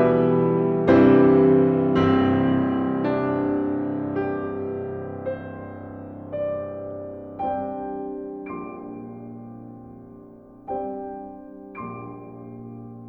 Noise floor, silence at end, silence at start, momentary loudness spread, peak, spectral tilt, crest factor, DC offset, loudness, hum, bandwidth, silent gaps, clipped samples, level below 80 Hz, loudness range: -45 dBFS; 0 s; 0 s; 23 LU; -4 dBFS; -10 dB/octave; 18 dB; under 0.1%; -22 LUFS; none; 4.6 kHz; none; under 0.1%; -54 dBFS; 17 LU